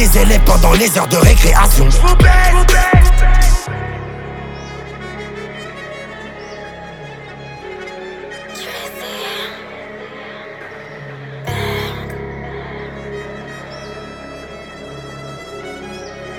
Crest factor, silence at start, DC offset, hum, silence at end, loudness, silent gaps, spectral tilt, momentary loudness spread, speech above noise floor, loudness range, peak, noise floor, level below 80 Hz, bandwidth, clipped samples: 14 dB; 0 s; under 0.1%; none; 0 s; -14 LUFS; none; -4.5 dB/octave; 20 LU; 24 dB; 18 LU; 0 dBFS; -32 dBFS; -16 dBFS; 19 kHz; under 0.1%